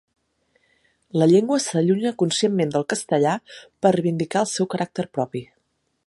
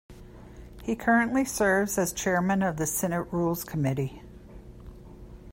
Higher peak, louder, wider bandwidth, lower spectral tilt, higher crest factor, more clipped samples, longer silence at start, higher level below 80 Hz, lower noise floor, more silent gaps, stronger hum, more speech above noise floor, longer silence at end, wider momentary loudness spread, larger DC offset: first, -4 dBFS vs -10 dBFS; first, -21 LUFS vs -27 LUFS; second, 11.5 kHz vs 16.5 kHz; about the same, -5.5 dB/octave vs -5 dB/octave; about the same, 18 dB vs 18 dB; neither; first, 1.15 s vs 0.1 s; second, -68 dBFS vs -50 dBFS; first, -71 dBFS vs -46 dBFS; neither; neither; first, 50 dB vs 20 dB; first, 0.65 s vs 0 s; second, 10 LU vs 24 LU; neither